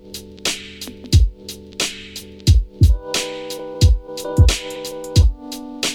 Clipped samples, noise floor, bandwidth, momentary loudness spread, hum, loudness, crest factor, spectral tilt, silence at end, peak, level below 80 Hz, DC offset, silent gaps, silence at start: under 0.1%; -36 dBFS; 16.5 kHz; 16 LU; none; -19 LUFS; 16 dB; -4.5 dB/octave; 0 s; -2 dBFS; -22 dBFS; under 0.1%; none; 0.05 s